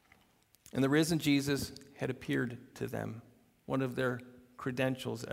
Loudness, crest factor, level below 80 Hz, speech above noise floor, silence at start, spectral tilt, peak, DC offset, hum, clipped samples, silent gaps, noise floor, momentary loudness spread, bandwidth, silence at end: -35 LUFS; 20 dB; -64 dBFS; 35 dB; 0.75 s; -5.5 dB/octave; -16 dBFS; under 0.1%; none; under 0.1%; none; -68 dBFS; 14 LU; 16 kHz; 0 s